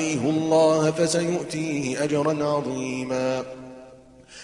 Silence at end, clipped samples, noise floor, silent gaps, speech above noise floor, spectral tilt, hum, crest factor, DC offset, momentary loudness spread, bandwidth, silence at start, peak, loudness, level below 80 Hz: 0 s; under 0.1%; -48 dBFS; none; 25 dB; -5 dB/octave; none; 16 dB; under 0.1%; 10 LU; 11.5 kHz; 0 s; -8 dBFS; -23 LUFS; -60 dBFS